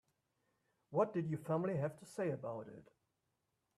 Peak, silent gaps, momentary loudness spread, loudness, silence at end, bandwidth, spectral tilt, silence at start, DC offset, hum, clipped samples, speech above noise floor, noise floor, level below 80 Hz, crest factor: -22 dBFS; none; 12 LU; -40 LUFS; 0.95 s; 13.5 kHz; -8.5 dB/octave; 0.9 s; under 0.1%; none; under 0.1%; 46 dB; -86 dBFS; -80 dBFS; 20 dB